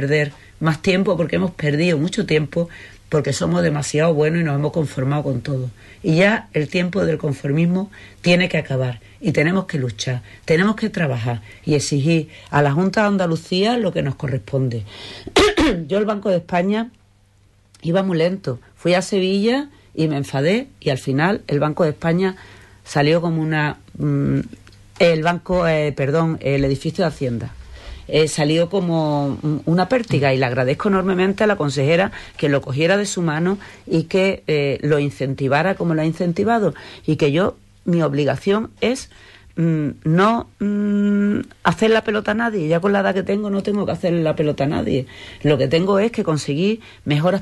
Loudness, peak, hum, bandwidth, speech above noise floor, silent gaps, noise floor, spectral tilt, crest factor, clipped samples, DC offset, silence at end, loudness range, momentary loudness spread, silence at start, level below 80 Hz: -19 LUFS; -2 dBFS; none; 12 kHz; 36 dB; none; -54 dBFS; -6 dB/octave; 16 dB; under 0.1%; under 0.1%; 0 s; 2 LU; 8 LU; 0 s; -44 dBFS